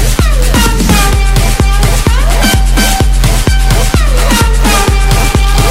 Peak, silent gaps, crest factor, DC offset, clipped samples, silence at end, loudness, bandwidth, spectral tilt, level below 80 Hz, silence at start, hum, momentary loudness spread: 0 dBFS; none; 8 dB; under 0.1%; 0.3%; 0 s; -10 LUFS; 16.5 kHz; -4 dB/octave; -8 dBFS; 0 s; none; 2 LU